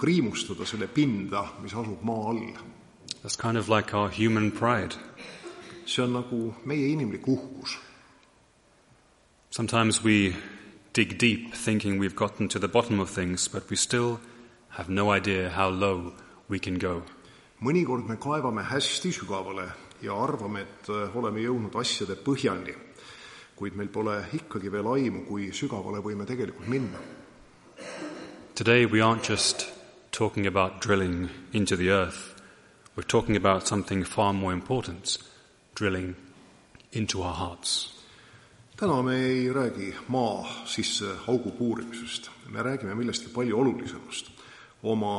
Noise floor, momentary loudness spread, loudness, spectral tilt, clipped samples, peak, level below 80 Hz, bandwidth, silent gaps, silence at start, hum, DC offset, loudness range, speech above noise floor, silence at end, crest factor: -62 dBFS; 15 LU; -28 LUFS; -4.5 dB/octave; under 0.1%; -6 dBFS; -58 dBFS; 11.5 kHz; none; 0 s; none; under 0.1%; 6 LU; 34 dB; 0 s; 24 dB